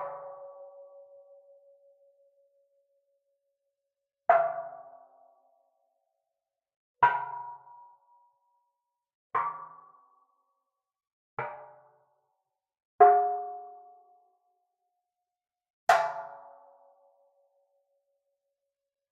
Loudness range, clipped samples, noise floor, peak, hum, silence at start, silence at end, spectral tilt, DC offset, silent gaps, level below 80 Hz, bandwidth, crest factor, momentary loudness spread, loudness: 12 LU; under 0.1%; -88 dBFS; -6 dBFS; none; 0 s; 2.7 s; -1.5 dB/octave; under 0.1%; 6.76-6.94 s, 9.15-9.30 s, 11.13-11.37 s, 12.85-12.99 s, 15.70-15.87 s; -82 dBFS; 7 kHz; 28 dB; 28 LU; -27 LUFS